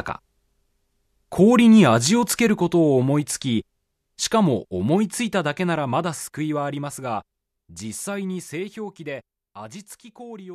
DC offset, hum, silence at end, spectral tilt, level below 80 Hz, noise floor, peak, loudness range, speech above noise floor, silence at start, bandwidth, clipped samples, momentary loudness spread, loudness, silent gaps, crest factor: under 0.1%; none; 0 s; -5 dB/octave; -58 dBFS; -69 dBFS; -4 dBFS; 13 LU; 48 dB; 0 s; 14 kHz; under 0.1%; 22 LU; -21 LUFS; none; 18 dB